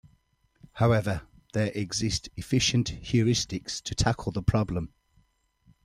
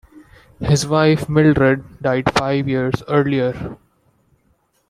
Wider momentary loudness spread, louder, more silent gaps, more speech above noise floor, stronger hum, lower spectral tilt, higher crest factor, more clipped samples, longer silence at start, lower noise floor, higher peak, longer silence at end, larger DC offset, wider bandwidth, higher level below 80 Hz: about the same, 10 LU vs 8 LU; second, -28 LUFS vs -17 LUFS; neither; second, 41 dB vs 45 dB; neither; about the same, -5 dB/octave vs -6 dB/octave; about the same, 20 dB vs 16 dB; neither; first, 0.75 s vs 0.15 s; first, -67 dBFS vs -62 dBFS; second, -10 dBFS vs -2 dBFS; second, 0.95 s vs 1.15 s; neither; about the same, 13.5 kHz vs 13.5 kHz; about the same, -44 dBFS vs -42 dBFS